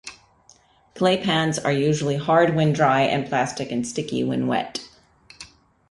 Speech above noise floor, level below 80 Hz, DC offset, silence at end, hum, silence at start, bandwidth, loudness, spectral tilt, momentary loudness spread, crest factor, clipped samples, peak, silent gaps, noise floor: 35 dB; -58 dBFS; under 0.1%; 0.45 s; none; 0.05 s; 11.5 kHz; -21 LUFS; -5.5 dB/octave; 15 LU; 18 dB; under 0.1%; -6 dBFS; none; -56 dBFS